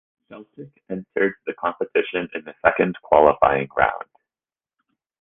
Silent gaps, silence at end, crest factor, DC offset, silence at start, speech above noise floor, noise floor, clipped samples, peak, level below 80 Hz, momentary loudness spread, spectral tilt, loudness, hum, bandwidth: none; 1.2 s; 22 dB; under 0.1%; 0.3 s; over 69 dB; under -90 dBFS; under 0.1%; 0 dBFS; -52 dBFS; 17 LU; -8.5 dB/octave; -21 LUFS; none; 3.8 kHz